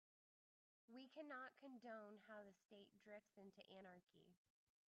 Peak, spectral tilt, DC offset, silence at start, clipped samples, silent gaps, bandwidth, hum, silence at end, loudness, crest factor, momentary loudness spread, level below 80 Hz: -46 dBFS; -3 dB/octave; under 0.1%; 0.9 s; under 0.1%; 2.65-2.69 s, 4.03-4.07 s; 7 kHz; none; 0.5 s; -62 LUFS; 18 dB; 10 LU; under -90 dBFS